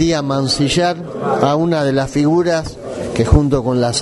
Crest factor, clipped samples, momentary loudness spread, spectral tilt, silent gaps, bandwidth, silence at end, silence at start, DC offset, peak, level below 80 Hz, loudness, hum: 16 dB; under 0.1%; 8 LU; -5.5 dB/octave; none; 11.5 kHz; 0 s; 0 s; under 0.1%; 0 dBFS; -28 dBFS; -16 LUFS; none